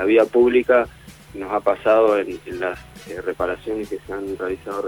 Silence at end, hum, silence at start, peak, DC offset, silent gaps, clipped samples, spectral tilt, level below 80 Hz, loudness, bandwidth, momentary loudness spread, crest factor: 0 s; none; 0 s; -4 dBFS; under 0.1%; none; under 0.1%; -6 dB/octave; -48 dBFS; -20 LUFS; 19 kHz; 14 LU; 16 dB